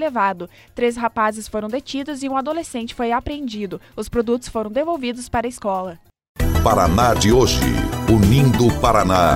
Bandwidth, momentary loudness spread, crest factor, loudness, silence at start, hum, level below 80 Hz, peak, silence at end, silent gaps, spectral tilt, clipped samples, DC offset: 16.5 kHz; 13 LU; 16 dB; -19 LUFS; 0 s; none; -30 dBFS; -4 dBFS; 0 s; 6.29-6.35 s; -5.5 dB/octave; under 0.1%; under 0.1%